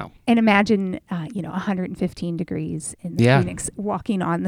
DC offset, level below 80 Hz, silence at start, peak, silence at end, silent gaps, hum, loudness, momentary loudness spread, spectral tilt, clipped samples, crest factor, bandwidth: under 0.1%; -50 dBFS; 0 s; -2 dBFS; 0 s; none; none; -22 LUFS; 12 LU; -6 dB/octave; under 0.1%; 20 dB; 13.5 kHz